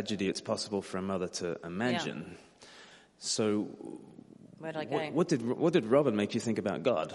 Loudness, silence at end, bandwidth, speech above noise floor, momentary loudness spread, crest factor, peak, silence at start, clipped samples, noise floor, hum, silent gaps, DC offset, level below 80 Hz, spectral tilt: -32 LUFS; 0 s; 11.5 kHz; 24 dB; 19 LU; 20 dB; -14 dBFS; 0 s; under 0.1%; -56 dBFS; none; none; under 0.1%; -74 dBFS; -5 dB/octave